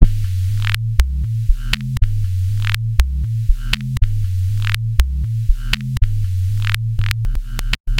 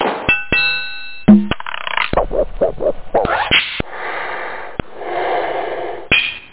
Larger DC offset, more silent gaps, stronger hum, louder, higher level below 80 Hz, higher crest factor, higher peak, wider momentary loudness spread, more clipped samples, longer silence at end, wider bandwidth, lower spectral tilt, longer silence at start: second, under 0.1% vs 3%; first, 7.80-7.84 s vs none; neither; second, -20 LUFS vs -16 LUFS; first, -20 dBFS vs -34 dBFS; about the same, 16 dB vs 18 dB; about the same, 0 dBFS vs 0 dBFS; second, 2 LU vs 13 LU; first, 0.2% vs under 0.1%; about the same, 0 s vs 0 s; first, 17 kHz vs 4 kHz; second, -5 dB/octave vs -9 dB/octave; about the same, 0 s vs 0 s